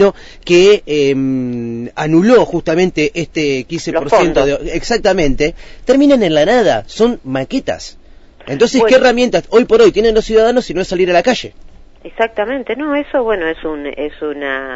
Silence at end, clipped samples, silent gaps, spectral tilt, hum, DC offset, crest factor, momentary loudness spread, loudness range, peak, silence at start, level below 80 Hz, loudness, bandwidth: 0 s; under 0.1%; none; -5 dB/octave; none; under 0.1%; 12 dB; 13 LU; 5 LU; 0 dBFS; 0 s; -32 dBFS; -13 LUFS; 8 kHz